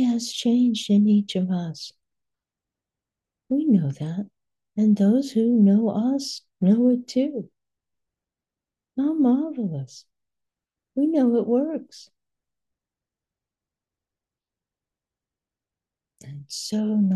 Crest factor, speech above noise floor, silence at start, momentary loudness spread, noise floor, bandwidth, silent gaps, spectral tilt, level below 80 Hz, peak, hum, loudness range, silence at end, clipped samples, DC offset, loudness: 16 dB; 68 dB; 0 s; 16 LU; -90 dBFS; 12 kHz; none; -7 dB/octave; -74 dBFS; -8 dBFS; none; 7 LU; 0 s; under 0.1%; under 0.1%; -22 LUFS